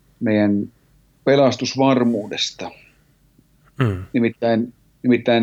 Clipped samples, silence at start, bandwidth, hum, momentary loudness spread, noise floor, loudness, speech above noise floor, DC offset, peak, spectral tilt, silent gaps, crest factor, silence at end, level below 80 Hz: under 0.1%; 0.2 s; 8 kHz; none; 9 LU; -57 dBFS; -19 LUFS; 39 dB; under 0.1%; -4 dBFS; -6 dB/octave; none; 16 dB; 0 s; -60 dBFS